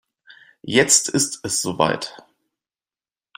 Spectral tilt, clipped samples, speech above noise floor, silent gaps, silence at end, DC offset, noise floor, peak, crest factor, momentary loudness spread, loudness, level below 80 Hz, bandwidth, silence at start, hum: -2 dB/octave; under 0.1%; over 70 dB; none; 1.2 s; under 0.1%; under -90 dBFS; 0 dBFS; 24 dB; 15 LU; -18 LUFS; -62 dBFS; 16.5 kHz; 0.65 s; none